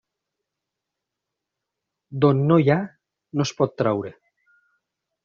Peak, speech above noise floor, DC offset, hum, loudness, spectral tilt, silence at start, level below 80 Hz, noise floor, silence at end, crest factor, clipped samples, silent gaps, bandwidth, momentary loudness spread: -4 dBFS; 64 dB; under 0.1%; none; -21 LUFS; -7 dB/octave; 2.1 s; -62 dBFS; -84 dBFS; 1.15 s; 20 dB; under 0.1%; none; 7.2 kHz; 18 LU